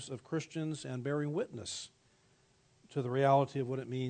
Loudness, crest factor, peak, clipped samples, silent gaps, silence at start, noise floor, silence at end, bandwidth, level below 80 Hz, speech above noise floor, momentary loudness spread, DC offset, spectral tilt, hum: -35 LUFS; 20 dB; -16 dBFS; under 0.1%; none; 0 s; -69 dBFS; 0 s; 9.4 kHz; -78 dBFS; 35 dB; 13 LU; under 0.1%; -6 dB/octave; none